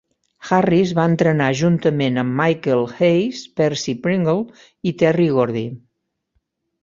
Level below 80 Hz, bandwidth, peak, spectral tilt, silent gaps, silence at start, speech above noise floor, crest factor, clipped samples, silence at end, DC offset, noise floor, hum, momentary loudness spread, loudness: -56 dBFS; 7.6 kHz; -2 dBFS; -6.5 dB/octave; none; 0.4 s; 56 dB; 16 dB; under 0.1%; 1.05 s; under 0.1%; -73 dBFS; none; 9 LU; -18 LUFS